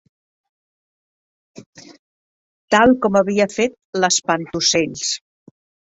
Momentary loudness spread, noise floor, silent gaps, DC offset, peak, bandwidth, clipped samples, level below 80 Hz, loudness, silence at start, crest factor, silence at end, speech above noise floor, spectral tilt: 9 LU; under -90 dBFS; 1.66-1.73 s, 1.99-2.68 s, 3.84-3.93 s; under 0.1%; -2 dBFS; 8.2 kHz; under 0.1%; -56 dBFS; -17 LUFS; 1.55 s; 20 dB; 0.7 s; over 73 dB; -3 dB/octave